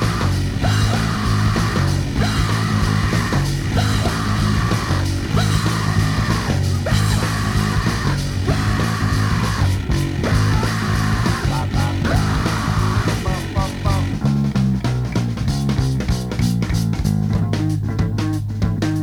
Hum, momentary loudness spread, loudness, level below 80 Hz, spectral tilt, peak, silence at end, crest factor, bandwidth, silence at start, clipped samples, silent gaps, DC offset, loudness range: none; 3 LU; -19 LUFS; -28 dBFS; -5.5 dB/octave; -4 dBFS; 0 s; 14 dB; 16.5 kHz; 0 s; under 0.1%; none; under 0.1%; 1 LU